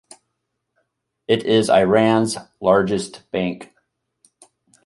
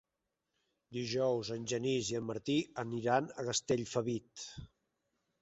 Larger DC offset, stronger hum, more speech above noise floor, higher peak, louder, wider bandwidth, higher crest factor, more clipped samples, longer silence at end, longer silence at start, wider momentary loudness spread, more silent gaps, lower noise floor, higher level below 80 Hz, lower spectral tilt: neither; neither; first, 58 dB vs 52 dB; first, -2 dBFS vs -16 dBFS; first, -18 LUFS vs -36 LUFS; first, 11.5 kHz vs 8.2 kHz; about the same, 18 dB vs 22 dB; neither; first, 1.2 s vs 0.75 s; first, 1.3 s vs 0.9 s; about the same, 12 LU vs 13 LU; neither; second, -76 dBFS vs -87 dBFS; first, -56 dBFS vs -68 dBFS; about the same, -5.5 dB/octave vs -4.5 dB/octave